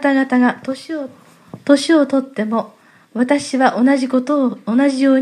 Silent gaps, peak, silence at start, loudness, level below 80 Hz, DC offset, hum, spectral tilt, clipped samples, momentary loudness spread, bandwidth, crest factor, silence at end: none; 0 dBFS; 0 s; -16 LUFS; -70 dBFS; under 0.1%; none; -5 dB/octave; under 0.1%; 13 LU; 11 kHz; 16 dB; 0 s